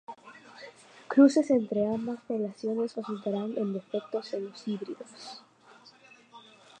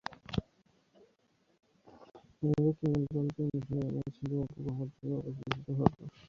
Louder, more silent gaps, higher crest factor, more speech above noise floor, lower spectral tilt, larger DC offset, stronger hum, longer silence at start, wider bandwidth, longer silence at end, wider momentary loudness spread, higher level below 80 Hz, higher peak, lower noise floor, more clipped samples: first, -29 LUFS vs -35 LUFS; neither; about the same, 22 dB vs 26 dB; second, 28 dB vs 39 dB; second, -6.5 dB/octave vs -8.5 dB/octave; neither; neither; about the same, 0.1 s vs 0.1 s; first, 9.4 kHz vs 7 kHz; first, 0.4 s vs 0 s; first, 26 LU vs 9 LU; second, -78 dBFS vs -58 dBFS; about the same, -10 dBFS vs -8 dBFS; second, -57 dBFS vs -73 dBFS; neither